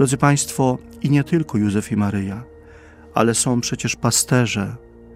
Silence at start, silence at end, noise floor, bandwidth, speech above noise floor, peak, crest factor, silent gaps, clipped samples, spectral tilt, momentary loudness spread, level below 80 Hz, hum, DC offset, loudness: 0 s; 0 s; -43 dBFS; 16 kHz; 25 dB; 0 dBFS; 20 dB; none; under 0.1%; -4.5 dB/octave; 9 LU; -48 dBFS; none; under 0.1%; -19 LUFS